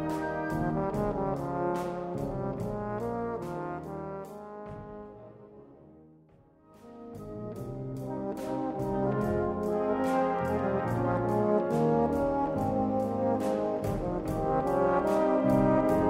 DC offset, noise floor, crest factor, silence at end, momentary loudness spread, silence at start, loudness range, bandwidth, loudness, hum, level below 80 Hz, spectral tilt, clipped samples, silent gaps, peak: under 0.1%; -59 dBFS; 18 dB; 0 s; 16 LU; 0 s; 15 LU; 16 kHz; -30 LUFS; none; -50 dBFS; -8.5 dB/octave; under 0.1%; none; -12 dBFS